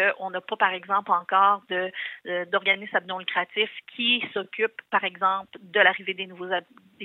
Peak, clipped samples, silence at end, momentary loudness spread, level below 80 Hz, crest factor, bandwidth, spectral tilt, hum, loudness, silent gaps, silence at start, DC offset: -4 dBFS; under 0.1%; 0 s; 11 LU; -86 dBFS; 22 dB; 4.3 kHz; -6 dB/octave; none; -25 LUFS; none; 0 s; under 0.1%